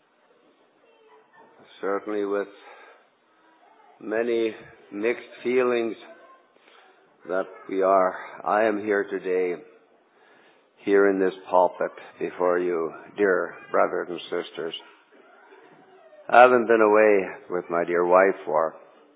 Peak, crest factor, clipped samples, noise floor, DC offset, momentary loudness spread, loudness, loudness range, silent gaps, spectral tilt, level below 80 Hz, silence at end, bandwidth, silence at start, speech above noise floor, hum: -2 dBFS; 24 dB; under 0.1%; -61 dBFS; under 0.1%; 15 LU; -23 LUFS; 11 LU; none; -9 dB/octave; -78 dBFS; 0.4 s; 4 kHz; 1.85 s; 38 dB; none